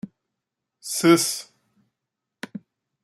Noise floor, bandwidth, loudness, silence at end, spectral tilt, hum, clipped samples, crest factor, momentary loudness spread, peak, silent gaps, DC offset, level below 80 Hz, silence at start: -84 dBFS; 15 kHz; -20 LUFS; 0.45 s; -3.5 dB/octave; none; under 0.1%; 22 dB; 24 LU; -4 dBFS; none; under 0.1%; -70 dBFS; 0.05 s